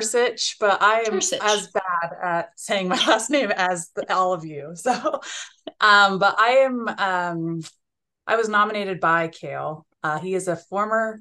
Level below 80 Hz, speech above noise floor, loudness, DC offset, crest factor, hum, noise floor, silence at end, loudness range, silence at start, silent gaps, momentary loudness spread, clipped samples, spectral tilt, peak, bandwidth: -76 dBFS; 28 dB; -21 LUFS; under 0.1%; 20 dB; none; -49 dBFS; 0 s; 4 LU; 0 s; none; 13 LU; under 0.1%; -2.5 dB/octave; -2 dBFS; 12.5 kHz